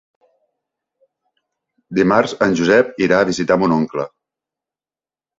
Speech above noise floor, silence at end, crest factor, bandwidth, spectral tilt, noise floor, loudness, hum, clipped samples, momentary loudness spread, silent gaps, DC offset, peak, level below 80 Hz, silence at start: over 75 dB; 1.3 s; 18 dB; 8 kHz; -5.5 dB/octave; under -90 dBFS; -16 LUFS; none; under 0.1%; 10 LU; none; under 0.1%; 0 dBFS; -54 dBFS; 1.9 s